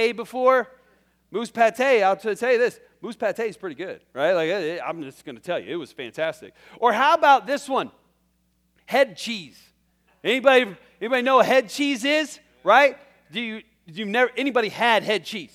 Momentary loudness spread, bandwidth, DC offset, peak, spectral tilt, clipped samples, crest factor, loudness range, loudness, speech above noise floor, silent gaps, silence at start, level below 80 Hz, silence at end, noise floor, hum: 17 LU; 15.5 kHz; under 0.1%; -2 dBFS; -3.5 dB/octave; under 0.1%; 20 dB; 6 LU; -21 LUFS; 45 dB; none; 0 s; -72 dBFS; 0.1 s; -67 dBFS; none